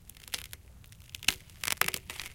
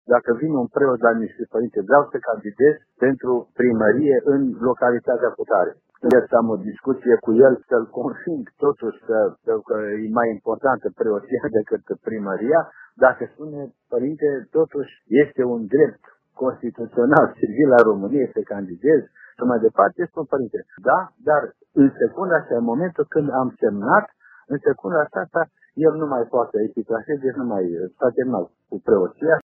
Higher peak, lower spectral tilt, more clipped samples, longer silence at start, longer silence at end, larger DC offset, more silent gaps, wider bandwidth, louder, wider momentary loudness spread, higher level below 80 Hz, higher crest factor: second, -4 dBFS vs 0 dBFS; second, 0 dB/octave vs -7.5 dB/octave; neither; about the same, 0 s vs 0.1 s; about the same, 0 s vs 0 s; neither; neither; first, 17 kHz vs 4.4 kHz; second, -33 LUFS vs -20 LUFS; first, 18 LU vs 9 LU; first, -56 dBFS vs -64 dBFS; first, 32 dB vs 20 dB